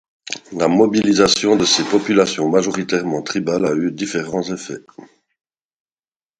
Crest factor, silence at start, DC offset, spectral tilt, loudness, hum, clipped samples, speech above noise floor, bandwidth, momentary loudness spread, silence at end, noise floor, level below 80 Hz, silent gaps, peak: 18 dB; 0.3 s; under 0.1%; -4 dB/octave; -17 LUFS; none; under 0.1%; over 73 dB; 11 kHz; 14 LU; 1.35 s; under -90 dBFS; -54 dBFS; none; 0 dBFS